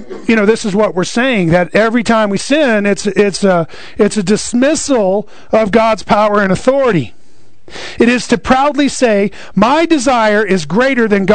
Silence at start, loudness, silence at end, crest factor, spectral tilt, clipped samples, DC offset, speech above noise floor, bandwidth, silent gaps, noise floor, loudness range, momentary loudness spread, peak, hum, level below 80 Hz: 0 s; -12 LUFS; 0 s; 12 dB; -5 dB/octave; under 0.1%; 4%; 36 dB; 9.4 kHz; none; -48 dBFS; 2 LU; 4 LU; 0 dBFS; none; -40 dBFS